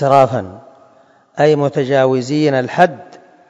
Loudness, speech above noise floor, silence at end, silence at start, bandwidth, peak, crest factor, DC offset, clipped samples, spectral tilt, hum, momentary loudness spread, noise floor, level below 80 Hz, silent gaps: -14 LUFS; 36 dB; 0.35 s; 0 s; 8.6 kHz; 0 dBFS; 16 dB; under 0.1%; 0.3%; -6.5 dB/octave; none; 16 LU; -50 dBFS; -60 dBFS; none